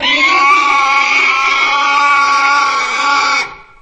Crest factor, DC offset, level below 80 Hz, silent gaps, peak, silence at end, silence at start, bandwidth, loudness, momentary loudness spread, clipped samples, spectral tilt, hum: 12 dB; under 0.1%; -50 dBFS; none; 0 dBFS; 0.2 s; 0 s; 8.8 kHz; -10 LUFS; 5 LU; under 0.1%; 0.5 dB/octave; none